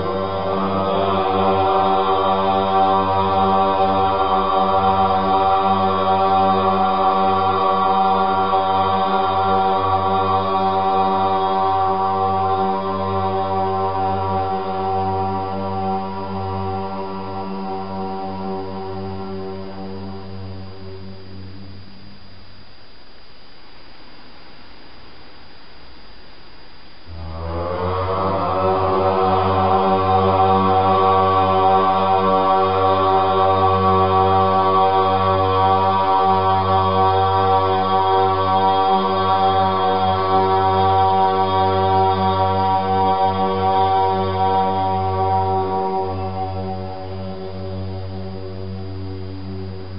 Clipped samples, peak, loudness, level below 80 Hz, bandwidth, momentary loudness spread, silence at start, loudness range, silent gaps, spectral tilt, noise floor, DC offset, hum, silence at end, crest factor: under 0.1%; -4 dBFS; -18 LUFS; -48 dBFS; 5.6 kHz; 14 LU; 0 s; 13 LU; none; -4.5 dB/octave; -45 dBFS; 2%; none; 0 s; 16 dB